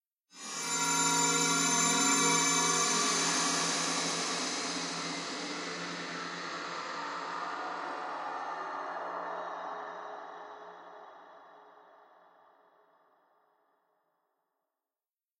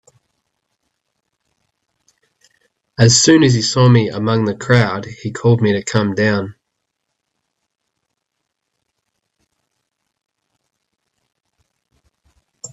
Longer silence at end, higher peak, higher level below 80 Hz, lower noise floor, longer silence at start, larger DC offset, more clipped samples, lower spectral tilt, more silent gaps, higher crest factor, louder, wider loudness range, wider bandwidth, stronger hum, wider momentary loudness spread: first, 3.6 s vs 0.05 s; second, -14 dBFS vs 0 dBFS; second, under -90 dBFS vs -52 dBFS; first, under -90 dBFS vs -76 dBFS; second, 0.35 s vs 3 s; neither; neither; second, -1 dB/octave vs -5 dB/octave; neither; about the same, 20 dB vs 18 dB; second, -30 LUFS vs -14 LUFS; first, 18 LU vs 10 LU; first, 13 kHz vs 8.4 kHz; neither; first, 18 LU vs 15 LU